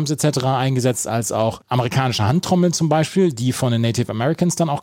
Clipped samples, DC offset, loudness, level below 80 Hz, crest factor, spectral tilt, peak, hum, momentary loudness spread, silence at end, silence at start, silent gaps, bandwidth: under 0.1%; under 0.1%; -19 LUFS; -54 dBFS; 14 dB; -5.5 dB/octave; -4 dBFS; none; 4 LU; 0 s; 0 s; none; 16.5 kHz